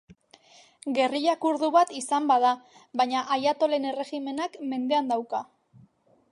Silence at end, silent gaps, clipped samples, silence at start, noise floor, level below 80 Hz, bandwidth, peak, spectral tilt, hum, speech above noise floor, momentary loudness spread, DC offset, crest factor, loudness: 0.9 s; none; under 0.1%; 0.85 s; -61 dBFS; -78 dBFS; 11.5 kHz; -10 dBFS; -3 dB/octave; none; 35 dB; 10 LU; under 0.1%; 18 dB; -26 LUFS